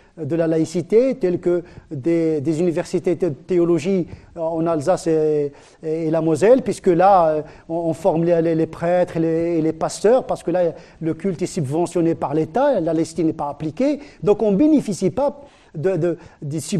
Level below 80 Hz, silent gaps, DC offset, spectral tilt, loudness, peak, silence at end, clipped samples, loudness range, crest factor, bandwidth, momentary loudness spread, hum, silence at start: -52 dBFS; none; under 0.1%; -7 dB/octave; -20 LUFS; -4 dBFS; 0 s; under 0.1%; 3 LU; 16 dB; 12.5 kHz; 10 LU; none; 0.15 s